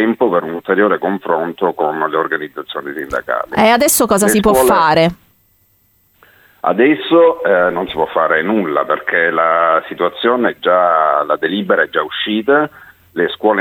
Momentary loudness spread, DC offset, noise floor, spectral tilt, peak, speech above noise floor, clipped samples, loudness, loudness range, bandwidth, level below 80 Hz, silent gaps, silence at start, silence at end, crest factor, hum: 9 LU; under 0.1%; -56 dBFS; -4 dB/octave; 0 dBFS; 42 dB; under 0.1%; -14 LUFS; 2 LU; 19 kHz; -46 dBFS; none; 0 s; 0 s; 14 dB; none